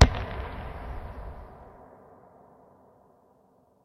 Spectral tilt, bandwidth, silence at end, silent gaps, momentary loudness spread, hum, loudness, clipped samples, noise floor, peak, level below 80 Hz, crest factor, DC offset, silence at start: -5.5 dB/octave; 8.8 kHz; 2 s; none; 20 LU; none; -32 LUFS; under 0.1%; -63 dBFS; 0 dBFS; -34 dBFS; 30 dB; under 0.1%; 0 s